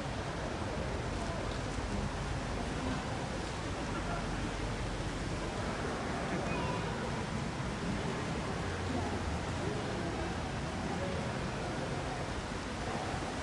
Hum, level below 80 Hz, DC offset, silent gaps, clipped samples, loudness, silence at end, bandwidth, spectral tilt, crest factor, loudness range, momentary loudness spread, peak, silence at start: none; -46 dBFS; under 0.1%; none; under 0.1%; -37 LUFS; 0 s; 11.5 kHz; -5.5 dB/octave; 14 dB; 1 LU; 2 LU; -22 dBFS; 0 s